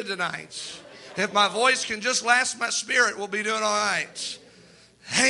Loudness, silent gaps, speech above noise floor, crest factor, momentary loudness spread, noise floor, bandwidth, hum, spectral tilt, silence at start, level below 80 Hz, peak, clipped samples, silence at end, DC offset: -23 LUFS; none; 28 dB; 20 dB; 15 LU; -53 dBFS; 11.5 kHz; none; -1 dB/octave; 0 s; -68 dBFS; -6 dBFS; under 0.1%; 0 s; under 0.1%